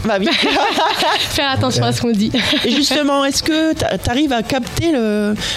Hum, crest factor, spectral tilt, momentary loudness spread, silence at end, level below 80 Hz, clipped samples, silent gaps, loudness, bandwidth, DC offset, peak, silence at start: none; 14 dB; -4 dB/octave; 4 LU; 0 s; -38 dBFS; under 0.1%; none; -15 LUFS; 16 kHz; under 0.1%; -2 dBFS; 0 s